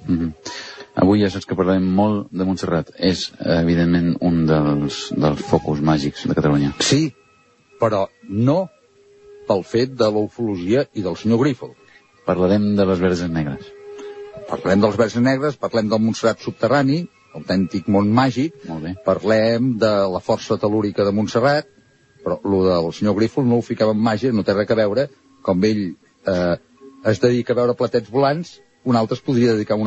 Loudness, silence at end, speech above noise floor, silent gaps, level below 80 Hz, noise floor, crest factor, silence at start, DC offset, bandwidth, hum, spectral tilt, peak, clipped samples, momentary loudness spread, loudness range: -19 LUFS; 0 s; 37 dB; none; -48 dBFS; -55 dBFS; 18 dB; 0 s; under 0.1%; 8.4 kHz; none; -6.5 dB/octave; -2 dBFS; under 0.1%; 10 LU; 2 LU